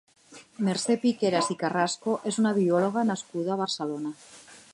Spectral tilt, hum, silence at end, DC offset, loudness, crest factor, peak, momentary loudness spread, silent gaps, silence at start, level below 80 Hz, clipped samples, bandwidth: -5 dB/octave; none; 0.15 s; under 0.1%; -27 LUFS; 18 dB; -10 dBFS; 9 LU; none; 0.3 s; -76 dBFS; under 0.1%; 11.5 kHz